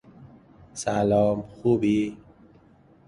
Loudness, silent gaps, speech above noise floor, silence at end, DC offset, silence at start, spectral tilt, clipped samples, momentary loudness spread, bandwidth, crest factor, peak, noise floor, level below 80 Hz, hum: -24 LUFS; none; 32 dB; 0.9 s; under 0.1%; 0.2 s; -6.5 dB/octave; under 0.1%; 11 LU; 11.5 kHz; 16 dB; -10 dBFS; -56 dBFS; -54 dBFS; none